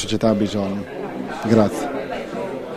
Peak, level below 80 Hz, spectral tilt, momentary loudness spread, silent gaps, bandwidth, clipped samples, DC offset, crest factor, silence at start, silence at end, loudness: -2 dBFS; -48 dBFS; -6 dB/octave; 11 LU; none; 14 kHz; under 0.1%; under 0.1%; 20 dB; 0 s; 0 s; -22 LUFS